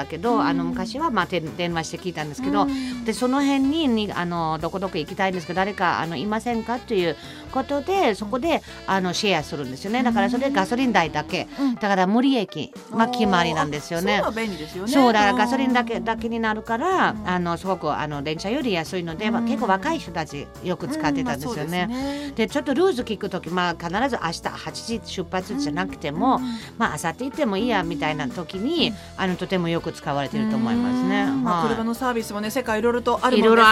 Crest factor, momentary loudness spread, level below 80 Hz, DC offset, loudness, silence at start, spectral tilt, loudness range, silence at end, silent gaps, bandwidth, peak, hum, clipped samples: 20 dB; 8 LU; -50 dBFS; under 0.1%; -23 LUFS; 0 s; -5 dB/octave; 4 LU; 0 s; none; 15.5 kHz; -2 dBFS; none; under 0.1%